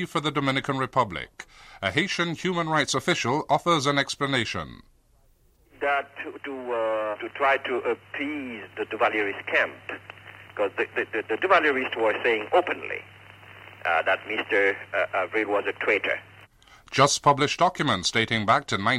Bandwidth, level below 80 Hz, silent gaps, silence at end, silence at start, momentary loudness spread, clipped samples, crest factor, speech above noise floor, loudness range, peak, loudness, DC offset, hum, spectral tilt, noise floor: 15.5 kHz; -60 dBFS; none; 0 s; 0 s; 14 LU; under 0.1%; 20 dB; 35 dB; 4 LU; -6 dBFS; -25 LUFS; under 0.1%; none; -4 dB/octave; -61 dBFS